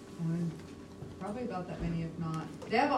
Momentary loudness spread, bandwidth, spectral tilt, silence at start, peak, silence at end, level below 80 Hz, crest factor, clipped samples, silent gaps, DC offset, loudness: 14 LU; 11.5 kHz; -7 dB/octave; 0 s; -16 dBFS; 0 s; -54 dBFS; 18 dB; under 0.1%; none; under 0.1%; -37 LUFS